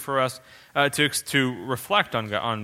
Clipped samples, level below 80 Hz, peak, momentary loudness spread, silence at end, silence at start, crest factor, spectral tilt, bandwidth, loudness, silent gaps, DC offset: under 0.1%; -62 dBFS; -4 dBFS; 8 LU; 0 s; 0 s; 22 dB; -3.5 dB/octave; 16.5 kHz; -24 LUFS; none; under 0.1%